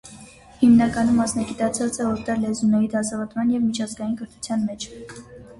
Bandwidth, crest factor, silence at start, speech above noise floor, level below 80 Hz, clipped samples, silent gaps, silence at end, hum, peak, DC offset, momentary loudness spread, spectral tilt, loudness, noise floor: 11.5 kHz; 16 dB; 0.05 s; 24 dB; -50 dBFS; under 0.1%; none; 0.05 s; none; -6 dBFS; under 0.1%; 17 LU; -5 dB/octave; -22 LUFS; -45 dBFS